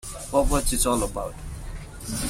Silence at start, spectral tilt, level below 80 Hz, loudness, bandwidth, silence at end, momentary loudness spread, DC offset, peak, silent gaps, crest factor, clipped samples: 0.05 s; -4 dB/octave; -32 dBFS; -25 LUFS; 16 kHz; 0 s; 16 LU; under 0.1%; -8 dBFS; none; 18 dB; under 0.1%